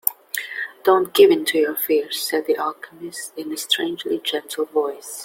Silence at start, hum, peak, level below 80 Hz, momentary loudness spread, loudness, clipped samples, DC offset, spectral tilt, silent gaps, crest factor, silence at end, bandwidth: 0.05 s; none; 0 dBFS; -70 dBFS; 15 LU; -20 LUFS; under 0.1%; under 0.1%; -2 dB/octave; none; 20 dB; 0 s; 17 kHz